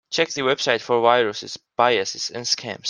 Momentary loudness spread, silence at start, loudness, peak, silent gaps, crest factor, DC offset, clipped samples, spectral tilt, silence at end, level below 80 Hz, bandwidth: 8 LU; 0.1 s; -20 LUFS; -2 dBFS; none; 20 dB; under 0.1%; under 0.1%; -2.5 dB/octave; 0 s; -68 dBFS; 10.5 kHz